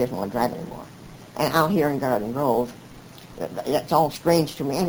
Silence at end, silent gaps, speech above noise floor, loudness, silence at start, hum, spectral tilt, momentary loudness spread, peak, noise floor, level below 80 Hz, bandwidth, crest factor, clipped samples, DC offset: 0 s; none; 21 dB; -23 LUFS; 0 s; none; -6 dB/octave; 22 LU; -4 dBFS; -44 dBFS; -52 dBFS; over 20 kHz; 20 dB; under 0.1%; under 0.1%